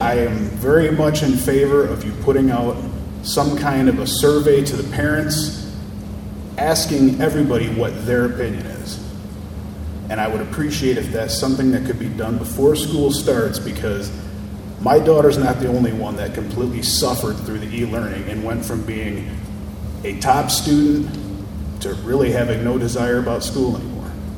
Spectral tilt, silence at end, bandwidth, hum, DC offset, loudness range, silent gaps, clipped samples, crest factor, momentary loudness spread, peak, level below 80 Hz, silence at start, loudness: -5.5 dB/octave; 0 s; 19 kHz; none; under 0.1%; 5 LU; none; under 0.1%; 18 dB; 14 LU; 0 dBFS; -36 dBFS; 0 s; -19 LUFS